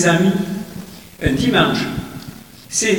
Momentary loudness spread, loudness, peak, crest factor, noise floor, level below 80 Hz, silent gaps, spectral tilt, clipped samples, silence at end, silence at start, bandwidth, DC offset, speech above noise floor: 20 LU; -18 LUFS; -2 dBFS; 18 dB; -37 dBFS; -40 dBFS; none; -4 dB/octave; under 0.1%; 0 s; 0 s; 19 kHz; 0.3%; 21 dB